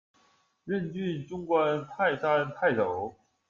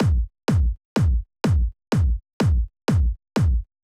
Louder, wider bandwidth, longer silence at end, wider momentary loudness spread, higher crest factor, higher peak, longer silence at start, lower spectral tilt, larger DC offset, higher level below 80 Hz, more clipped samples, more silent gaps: second, -29 LUFS vs -23 LUFS; second, 7.4 kHz vs 11.5 kHz; first, 0.4 s vs 0.2 s; first, 10 LU vs 2 LU; first, 18 dB vs 12 dB; about the same, -12 dBFS vs -10 dBFS; first, 0.65 s vs 0 s; about the same, -7.5 dB/octave vs -7.5 dB/octave; neither; second, -68 dBFS vs -24 dBFS; neither; second, none vs 0.85-0.96 s, 2.33-2.40 s